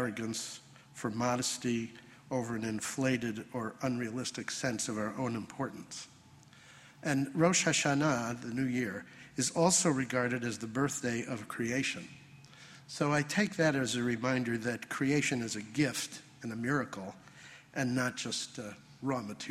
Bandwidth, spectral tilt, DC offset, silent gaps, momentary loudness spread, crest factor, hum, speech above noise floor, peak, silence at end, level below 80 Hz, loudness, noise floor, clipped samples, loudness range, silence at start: 15 kHz; -4 dB/octave; under 0.1%; none; 16 LU; 22 dB; none; 24 dB; -12 dBFS; 0 s; -70 dBFS; -33 LUFS; -58 dBFS; under 0.1%; 6 LU; 0 s